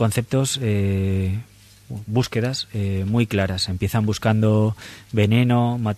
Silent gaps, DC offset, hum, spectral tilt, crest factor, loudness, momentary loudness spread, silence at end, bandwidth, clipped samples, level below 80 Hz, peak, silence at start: none; under 0.1%; none; -6 dB/octave; 16 dB; -21 LUFS; 8 LU; 0 s; 14 kHz; under 0.1%; -48 dBFS; -4 dBFS; 0 s